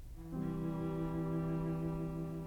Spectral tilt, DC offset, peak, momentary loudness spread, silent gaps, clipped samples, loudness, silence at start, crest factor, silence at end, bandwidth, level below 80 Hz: -9.5 dB/octave; under 0.1%; -28 dBFS; 4 LU; none; under 0.1%; -39 LUFS; 0 s; 12 dB; 0 s; 13 kHz; -52 dBFS